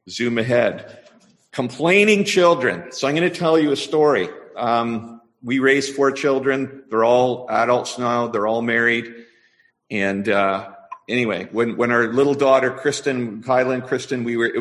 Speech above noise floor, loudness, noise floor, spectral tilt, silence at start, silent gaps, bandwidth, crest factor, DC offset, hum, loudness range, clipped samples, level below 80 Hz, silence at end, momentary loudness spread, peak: 41 dB; -19 LUFS; -60 dBFS; -5 dB/octave; 0.05 s; none; 12 kHz; 18 dB; under 0.1%; none; 4 LU; under 0.1%; -62 dBFS; 0 s; 11 LU; -2 dBFS